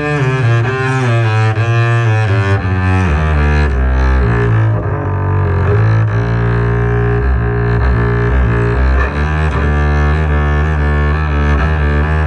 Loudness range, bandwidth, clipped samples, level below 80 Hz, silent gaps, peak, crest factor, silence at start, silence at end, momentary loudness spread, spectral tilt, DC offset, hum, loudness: 1 LU; 8.6 kHz; under 0.1%; -16 dBFS; none; -2 dBFS; 10 dB; 0 s; 0 s; 2 LU; -8 dB/octave; under 0.1%; none; -13 LUFS